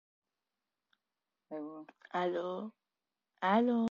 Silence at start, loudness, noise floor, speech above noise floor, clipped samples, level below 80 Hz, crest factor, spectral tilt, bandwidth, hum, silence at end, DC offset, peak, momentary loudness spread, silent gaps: 1.5 s; -34 LUFS; under -90 dBFS; over 56 dB; under 0.1%; -82 dBFS; 20 dB; -7 dB/octave; 7.2 kHz; none; 0.05 s; under 0.1%; -16 dBFS; 18 LU; none